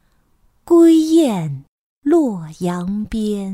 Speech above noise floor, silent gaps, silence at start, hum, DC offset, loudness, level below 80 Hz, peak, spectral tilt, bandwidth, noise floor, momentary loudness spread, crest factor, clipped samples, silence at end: 42 dB; 1.68-2.02 s; 0.65 s; none; under 0.1%; -16 LUFS; -46 dBFS; -2 dBFS; -7 dB/octave; 13 kHz; -58 dBFS; 14 LU; 14 dB; under 0.1%; 0 s